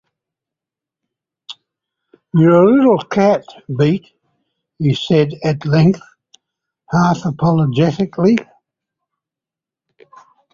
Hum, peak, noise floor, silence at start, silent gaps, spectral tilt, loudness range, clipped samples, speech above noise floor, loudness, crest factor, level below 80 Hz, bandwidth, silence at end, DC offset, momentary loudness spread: none; -2 dBFS; -87 dBFS; 1.5 s; none; -8 dB/octave; 3 LU; under 0.1%; 74 dB; -15 LUFS; 16 dB; -52 dBFS; 7.4 kHz; 2.1 s; under 0.1%; 11 LU